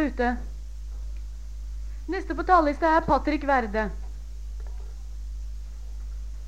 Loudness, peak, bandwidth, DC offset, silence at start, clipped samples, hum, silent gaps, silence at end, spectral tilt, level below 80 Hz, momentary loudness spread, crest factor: -24 LUFS; -6 dBFS; 8.8 kHz; 0.7%; 0 s; under 0.1%; 50 Hz at -50 dBFS; none; 0 s; -7 dB/octave; -34 dBFS; 19 LU; 20 dB